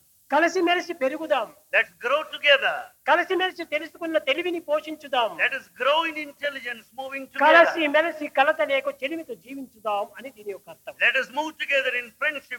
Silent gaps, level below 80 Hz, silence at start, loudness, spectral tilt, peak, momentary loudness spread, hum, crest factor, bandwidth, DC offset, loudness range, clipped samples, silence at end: none; -76 dBFS; 0.3 s; -23 LUFS; -2 dB/octave; -4 dBFS; 15 LU; none; 20 dB; 18 kHz; under 0.1%; 4 LU; under 0.1%; 0 s